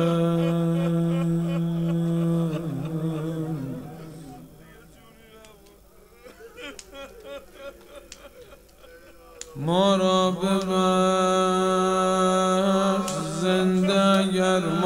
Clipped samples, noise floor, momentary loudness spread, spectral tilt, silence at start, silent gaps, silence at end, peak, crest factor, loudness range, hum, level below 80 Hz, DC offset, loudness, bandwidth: under 0.1%; -52 dBFS; 21 LU; -6 dB/octave; 0 s; none; 0 s; -8 dBFS; 16 dB; 22 LU; none; -56 dBFS; under 0.1%; -23 LUFS; 16 kHz